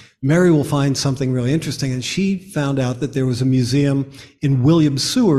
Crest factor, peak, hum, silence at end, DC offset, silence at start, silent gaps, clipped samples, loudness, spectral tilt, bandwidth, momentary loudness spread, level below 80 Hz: 12 dB; -4 dBFS; none; 0 s; under 0.1%; 0.2 s; none; under 0.1%; -18 LUFS; -6 dB/octave; 13.5 kHz; 7 LU; -48 dBFS